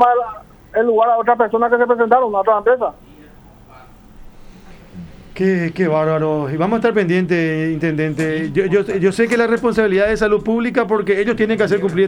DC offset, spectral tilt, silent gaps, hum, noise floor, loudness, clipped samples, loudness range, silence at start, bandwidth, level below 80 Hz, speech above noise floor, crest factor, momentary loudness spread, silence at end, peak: under 0.1%; -7 dB/octave; none; none; -42 dBFS; -16 LUFS; under 0.1%; 6 LU; 0 s; over 20 kHz; -44 dBFS; 27 dB; 16 dB; 6 LU; 0 s; 0 dBFS